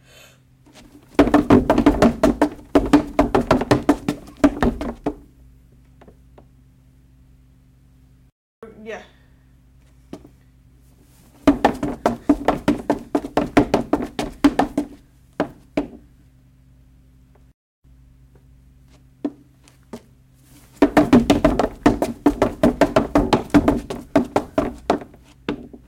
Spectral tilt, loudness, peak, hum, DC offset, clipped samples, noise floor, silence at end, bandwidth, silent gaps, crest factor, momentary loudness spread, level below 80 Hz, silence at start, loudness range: -6.5 dB/octave; -19 LUFS; -4 dBFS; none; under 0.1%; under 0.1%; -52 dBFS; 0.1 s; 16 kHz; 8.32-8.62 s, 17.54-17.82 s; 18 dB; 19 LU; -36 dBFS; 1.2 s; 19 LU